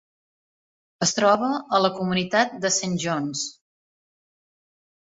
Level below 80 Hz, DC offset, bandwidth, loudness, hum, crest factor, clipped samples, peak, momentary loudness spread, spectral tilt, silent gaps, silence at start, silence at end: -66 dBFS; under 0.1%; 8 kHz; -23 LUFS; none; 22 dB; under 0.1%; -4 dBFS; 7 LU; -3.5 dB/octave; none; 1 s; 1.6 s